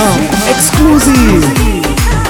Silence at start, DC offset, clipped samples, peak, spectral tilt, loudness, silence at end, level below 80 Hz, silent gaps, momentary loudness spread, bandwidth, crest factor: 0 s; under 0.1%; 0.5%; 0 dBFS; -4.5 dB/octave; -8 LUFS; 0 s; -16 dBFS; none; 5 LU; over 20 kHz; 8 dB